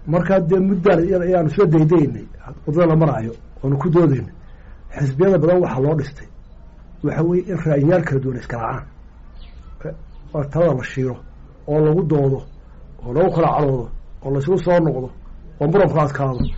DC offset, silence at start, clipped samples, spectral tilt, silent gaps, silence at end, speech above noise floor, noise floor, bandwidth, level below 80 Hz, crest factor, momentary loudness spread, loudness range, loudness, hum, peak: under 0.1%; 0 s; under 0.1%; -8.5 dB/octave; none; 0 s; 23 dB; -40 dBFS; 7.8 kHz; -36 dBFS; 12 dB; 16 LU; 5 LU; -18 LUFS; none; -8 dBFS